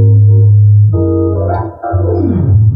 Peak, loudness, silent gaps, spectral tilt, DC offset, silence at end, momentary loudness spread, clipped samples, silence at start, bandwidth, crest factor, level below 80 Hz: 0 dBFS; -10 LUFS; none; -14.5 dB/octave; under 0.1%; 0 s; 9 LU; under 0.1%; 0 s; 1.8 kHz; 8 dB; -32 dBFS